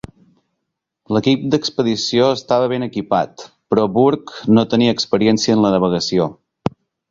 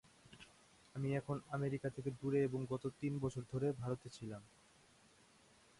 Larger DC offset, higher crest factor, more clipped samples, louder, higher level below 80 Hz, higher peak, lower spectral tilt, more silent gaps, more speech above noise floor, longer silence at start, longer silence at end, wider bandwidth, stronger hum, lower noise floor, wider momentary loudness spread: neither; about the same, 16 dB vs 18 dB; neither; first, -17 LUFS vs -42 LUFS; first, -52 dBFS vs -72 dBFS; first, -2 dBFS vs -26 dBFS; second, -5.5 dB/octave vs -7.5 dB/octave; neither; first, 61 dB vs 27 dB; first, 1.1 s vs 0.3 s; second, 0.4 s vs 1.35 s; second, 7.6 kHz vs 11.5 kHz; neither; first, -77 dBFS vs -68 dBFS; second, 9 LU vs 21 LU